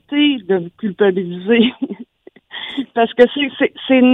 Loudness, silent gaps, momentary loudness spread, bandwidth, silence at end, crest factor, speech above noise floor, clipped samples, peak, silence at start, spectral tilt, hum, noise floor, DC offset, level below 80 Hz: -16 LUFS; none; 14 LU; 4.1 kHz; 0 s; 16 dB; 32 dB; under 0.1%; 0 dBFS; 0.1 s; -7.5 dB/octave; none; -46 dBFS; under 0.1%; -60 dBFS